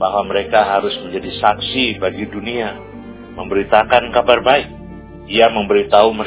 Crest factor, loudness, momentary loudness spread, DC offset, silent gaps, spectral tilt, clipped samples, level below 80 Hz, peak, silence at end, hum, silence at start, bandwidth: 16 dB; -15 LUFS; 20 LU; under 0.1%; none; -8.5 dB/octave; 0.2%; -42 dBFS; 0 dBFS; 0 s; none; 0 s; 4 kHz